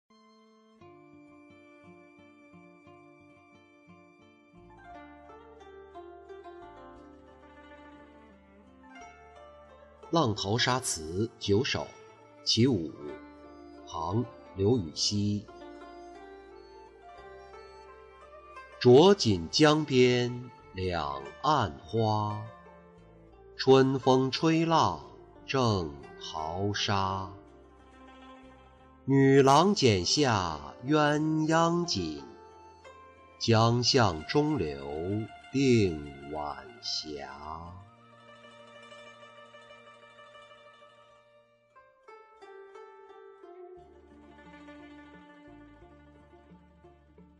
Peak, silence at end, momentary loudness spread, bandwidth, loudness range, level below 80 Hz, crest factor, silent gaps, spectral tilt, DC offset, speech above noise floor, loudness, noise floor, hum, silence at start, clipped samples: -10 dBFS; 1.85 s; 27 LU; 11 kHz; 18 LU; -58 dBFS; 20 dB; none; -5 dB/octave; under 0.1%; 37 dB; -27 LUFS; -63 dBFS; none; 1.9 s; under 0.1%